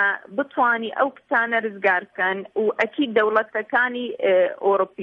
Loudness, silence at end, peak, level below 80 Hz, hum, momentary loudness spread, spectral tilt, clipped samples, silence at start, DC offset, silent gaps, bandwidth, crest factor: -21 LUFS; 0 s; -6 dBFS; -74 dBFS; none; 5 LU; -6 dB/octave; under 0.1%; 0 s; under 0.1%; none; 7 kHz; 16 dB